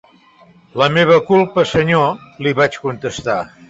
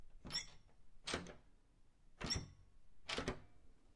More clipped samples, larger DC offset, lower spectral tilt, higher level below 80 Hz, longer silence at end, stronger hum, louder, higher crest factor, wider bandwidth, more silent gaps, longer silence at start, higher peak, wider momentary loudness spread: neither; neither; first, -6 dB/octave vs -3 dB/octave; first, -48 dBFS vs -60 dBFS; first, 0.25 s vs 0 s; neither; first, -15 LUFS vs -46 LUFS; second, 14 dB vs 24 dB; second, 8 kHz vs 11.5 kHz; neither; first, 0.75 s vs 0 s; first, -2 dBFS vs -26 dBFS; second, 11 LU vs 15 LU